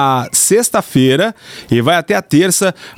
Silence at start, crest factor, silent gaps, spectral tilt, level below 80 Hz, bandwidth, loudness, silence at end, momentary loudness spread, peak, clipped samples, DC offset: 0 s; 12 dB; none; -4 dB/octave; -50 dBFS; 17 kHz; -12 LUFS; 0.05 s; 6 LU; -2 dBFS; under 0.1%; under 0.1%